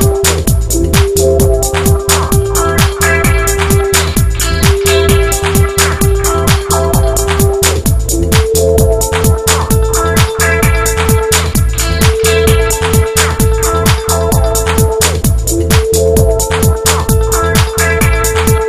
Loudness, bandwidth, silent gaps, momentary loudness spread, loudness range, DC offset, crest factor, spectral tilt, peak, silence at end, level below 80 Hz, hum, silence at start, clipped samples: -10 LUFS; 16 kHz; none; 2 LU; 1 LU; 0.5%; 10 dB; -4 dB/octave; 0 dBFS; 0 s; -16 dBFS; none; 0 s; 0.2%